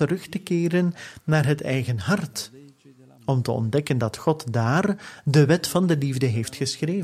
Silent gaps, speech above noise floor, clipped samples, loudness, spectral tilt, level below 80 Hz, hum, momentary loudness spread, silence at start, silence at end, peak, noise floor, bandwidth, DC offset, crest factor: none; 29 dB; under 0.1%; -23 LUFS; -6 dB/octave; -58 dBFS; none; 9 LU; 0 s; 0 s; -6 dBFS; -52 dBFS; 15 kHz; under 0.1%; 18 dB